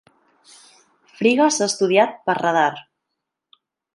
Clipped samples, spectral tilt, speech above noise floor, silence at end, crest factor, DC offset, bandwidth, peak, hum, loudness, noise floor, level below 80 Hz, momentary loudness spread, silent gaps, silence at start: under 0.1%; -3.5 dB/octave; 62 dB; 1.15 s; 20 dB; under 0.1%; 11.5 kHz; -2 dBFS; none; -18 LUFS; -80 dBFS; -74 dBFS; 5 LU; none; 1.2 s